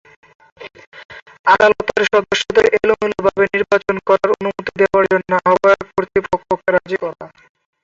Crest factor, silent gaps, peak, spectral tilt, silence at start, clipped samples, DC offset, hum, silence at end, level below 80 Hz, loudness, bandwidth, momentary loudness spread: 16 dB; 0.87-0.92 s, 1.05-1.09 s, 1.39-1.44 s; 0 dBFS; -4.5 dB/octave; 0.6 s; under 0.1%; under 0.1%; none; 0.55 s; -50 dBFS; -15 LUFS; 7.8 kHz; 10 LU